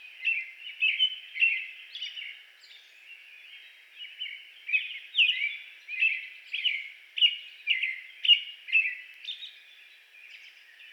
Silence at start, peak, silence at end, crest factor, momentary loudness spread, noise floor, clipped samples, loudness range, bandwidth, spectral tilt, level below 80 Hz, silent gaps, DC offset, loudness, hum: 0 s; -10 dBFS; 0 s; 22 dB; 24 LU; -54 dBFS; under 0.1%; 7 LU; 18 kHz; 7.5 dB/octave; under -90 dBFS; none; under 0.1%; -27 LUFS; none